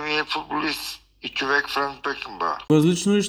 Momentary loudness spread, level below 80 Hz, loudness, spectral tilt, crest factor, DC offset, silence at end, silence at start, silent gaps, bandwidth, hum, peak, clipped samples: 11 LU; -56 dBFS; -23 LUFS; -4.5 dB/octave; 18 dB; under 0.1%; 0 s; 0 s; none; over 20 kHz; none; -6 dBFS; under 0.1%